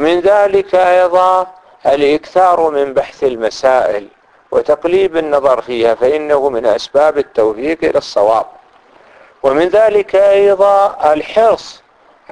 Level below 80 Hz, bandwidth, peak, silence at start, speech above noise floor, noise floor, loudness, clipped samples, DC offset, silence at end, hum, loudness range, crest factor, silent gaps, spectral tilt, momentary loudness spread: -48 dBFS; 10.5 kHz; 0 dBFS; 0 s; 33 dB; -45 dBFS; -12 LUFS; under 0.1%; under 0.1%; 0.6 s; none; 3 LU; 12 dB; none; -5 dB/octave; 7 LU